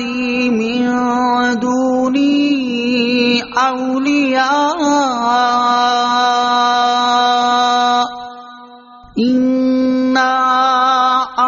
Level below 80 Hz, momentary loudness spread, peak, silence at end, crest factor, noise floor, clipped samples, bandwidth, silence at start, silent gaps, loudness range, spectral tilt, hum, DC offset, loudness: -54 dBFS; 4 LU; -2 dBFS; 0 s; 12 dB; -39 dBFS; under 0.1%; 7.4 kHz; 0 s; none; 2 LU; -1 dB/octave; none; under 0.1%; -14 LUFS